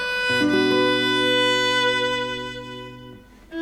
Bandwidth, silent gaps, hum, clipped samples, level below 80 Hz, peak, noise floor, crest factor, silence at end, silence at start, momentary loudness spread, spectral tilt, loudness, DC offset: 15.5 kHz; none; 50 Hz at -55 dBFS; under 0.1%; -52 dBFS; -10 dBFS; -44 dBFS; 12 dB; 0 s; 0 s; 18 LU; -3.5 dB/octave; -20 LUFS; under 0.1%